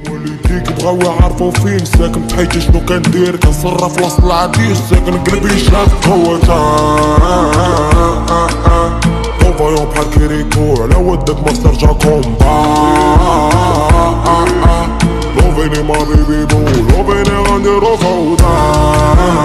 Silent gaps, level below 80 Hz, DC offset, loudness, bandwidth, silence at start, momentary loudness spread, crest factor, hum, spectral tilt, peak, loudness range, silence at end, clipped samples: none; -14 dBFS; under 0.1%; -10 LUFS; 14 kHz; 0 s; 4 LU; 10 dB; none; -6 dB/octave; 0 dBFS; 2 LU; 0 s; 0.3%